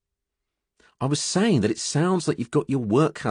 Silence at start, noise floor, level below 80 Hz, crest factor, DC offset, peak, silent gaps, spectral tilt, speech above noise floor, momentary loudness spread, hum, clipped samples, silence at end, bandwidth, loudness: 1 s; -83 dBFS; -62 dBFS; 16 dB; under 0.1%; -8 dBFS; none; -5.5 dB/octave; 61 dB; 4 LU; none; under 0.1%; 0 s; 11 kHz; -23 LUFS